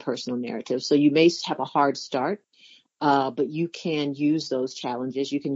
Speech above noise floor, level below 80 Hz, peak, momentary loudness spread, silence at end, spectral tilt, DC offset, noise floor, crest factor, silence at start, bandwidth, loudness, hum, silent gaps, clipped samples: 31 dB; -80 dBFS; -6 dBFS; 10 LU; 0 s; -5.5 dB/octave; under 0.1%; -55 dBFS; 18 dB; 0 s; 7.8 kHz; -25 LUFS; none; none; under 0.1%